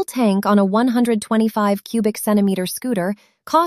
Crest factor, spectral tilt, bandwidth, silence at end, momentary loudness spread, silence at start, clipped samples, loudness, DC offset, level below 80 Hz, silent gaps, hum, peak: 14 dB; -6 dB/octave; 15 kHz; 0 s; 7 LU; 0 s; under 0.1%; -18 LUFS; under 0.1%; -64 dBFS; none; none; -4 dBFS